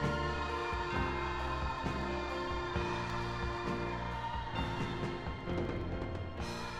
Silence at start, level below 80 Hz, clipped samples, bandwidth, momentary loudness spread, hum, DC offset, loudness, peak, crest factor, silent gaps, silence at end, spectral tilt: 0 s; -44 dBFS; under 0.1%; 12.5 kHz; 4 LU; none; under 0.1%; -37 LUFS; -20 dBFS; 16 dB; none; 0 s; -6 dB/octave